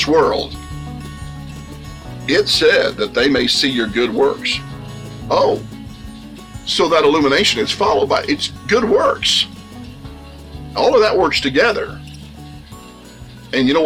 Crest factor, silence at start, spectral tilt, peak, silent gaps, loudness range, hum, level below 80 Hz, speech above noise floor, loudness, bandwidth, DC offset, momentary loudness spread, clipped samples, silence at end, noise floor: 14 dB; 0 s; -4 dB/octave; -2 dBFS; none; 3 LU; none; -40 dBFS; 22 dB; -15 LUFS; 16.5 kHz; under 0.1%; 22 LU; under 0.1%; 0 s; -37 dBFS